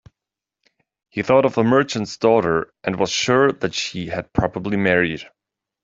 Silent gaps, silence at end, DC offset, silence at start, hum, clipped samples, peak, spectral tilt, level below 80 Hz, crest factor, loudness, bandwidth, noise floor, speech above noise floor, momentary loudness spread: none; 0.6 s; under 0.1%; 1.15 s; none; under 0.1%; -2 dBFS; -5 dB/octave; -48 dBFS; 18 dB; -19 LUFS; 7.8 kHz; -86 dBFS; 67 dB; 9 LU